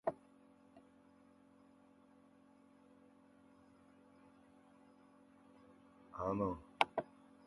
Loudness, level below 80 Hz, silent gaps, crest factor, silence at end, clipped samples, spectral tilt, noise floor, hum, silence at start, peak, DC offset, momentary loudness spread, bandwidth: -41 LUFS; -72 dBFS; none; 36 dB; 0.4 s; under 0.1%; -6 dB/octave; -67 dBFS; none; 0.05 s; -12 dBFS; under 0.1%; 28 LU; 11.5 kHz